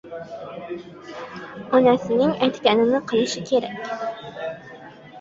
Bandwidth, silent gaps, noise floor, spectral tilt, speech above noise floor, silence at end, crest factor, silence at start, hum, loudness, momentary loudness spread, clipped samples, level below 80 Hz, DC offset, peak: 7.8 kHz; none; -42 dBFS; -5 dB/octave; 20 dB; 0 s; 20 dB; 0.05 s; none; -21 LUFS; 19 LU; under 0.1%; -62 dBFS; under 0.1%; -2 dBFS